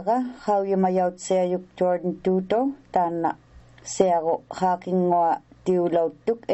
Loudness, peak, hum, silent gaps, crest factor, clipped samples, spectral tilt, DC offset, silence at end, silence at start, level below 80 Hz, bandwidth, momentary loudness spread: -24 LUFS; -4 dBFS; none; none; 20 dB; under 0.1%; -6.5 dB/octave; under 0.1%; 0 s; 0 s; -60 dBFS; 8.2 kHz; 6 LU